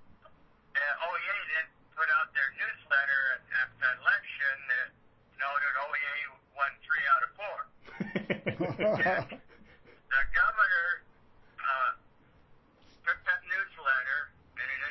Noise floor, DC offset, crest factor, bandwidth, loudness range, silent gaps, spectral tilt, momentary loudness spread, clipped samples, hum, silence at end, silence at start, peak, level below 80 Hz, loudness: -61 dBFS; under 0.1%; 18 dB; 6 kHz; 3 LU; none; -6 dB/octave; 12 LU; under 0.1%; none; 0 s; 0 s; -14 dBFS; -58 dBFS; -30 LUFS